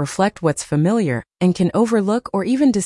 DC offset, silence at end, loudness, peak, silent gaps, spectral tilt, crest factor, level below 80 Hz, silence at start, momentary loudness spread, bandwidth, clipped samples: under 0.1%; 0 s; -18 LUFS; -6 dBFS; none; -6.5 dB/octave; 12 dB; -54 dBFS; 0 s; 4 LU; 12 kHz; under 0.1%